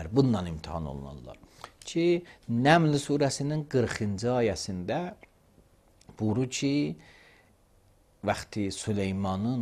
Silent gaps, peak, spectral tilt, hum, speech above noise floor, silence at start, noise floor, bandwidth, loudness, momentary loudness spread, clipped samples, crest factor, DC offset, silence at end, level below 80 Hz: none; -6 dBFS; -6 dB/octave; none; 34 dB; 0 s; -62 dBFS; 14 kHz; -29 LUFS; 16 LU; under 0.1%; 22 dB; under 0.1%; 0 s; -54 dBFS